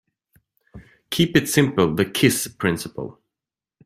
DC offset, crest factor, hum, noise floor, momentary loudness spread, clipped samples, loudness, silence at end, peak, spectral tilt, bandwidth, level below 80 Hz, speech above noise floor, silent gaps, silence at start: under 0.1%; 20 dB; none; -89 dBFS; 14 LU; under 0.1%; -20 LUFS; 0.75 s; -2 dBFS; -4.5 dB/octave; 16 kHz; -52 dBFS; 69 dB; none; 0.75 s